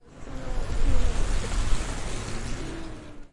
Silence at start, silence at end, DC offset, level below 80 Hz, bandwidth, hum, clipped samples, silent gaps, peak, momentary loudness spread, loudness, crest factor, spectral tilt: 0.15 s; 0.05 s; under 0.1%; -28 dBFS; 11.5 kHz; none; under 0.1%; none; -8 dBFS; 11 LU; -33 LUFS; 16 dB; -4.5 dB/octave